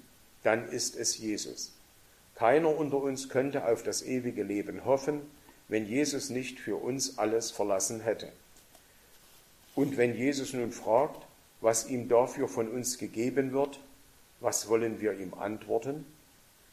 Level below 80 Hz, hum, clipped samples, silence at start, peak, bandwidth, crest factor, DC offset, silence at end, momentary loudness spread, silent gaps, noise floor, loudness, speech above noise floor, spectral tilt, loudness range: -68 dBFS; none; under 0.1%; 0.45 s; -10 dBFS; 15 kHz; 22 dB; under 0.1%; 0.6 s; 9 LU; none; -60 dBFS; -31 LUFS; 30 dB; -4 dB/octave; 4 LU